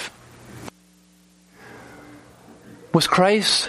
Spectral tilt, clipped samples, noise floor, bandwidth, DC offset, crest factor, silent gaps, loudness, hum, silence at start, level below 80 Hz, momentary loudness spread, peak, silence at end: -3.5 dB/octave; under 0.1%; -55 dBFS; 15 kHz; under 0.1%; 22 dB; none; -18 LUFS; none; 0 s; -58 dBFS; 27 LU; -2 dBFS; 0 s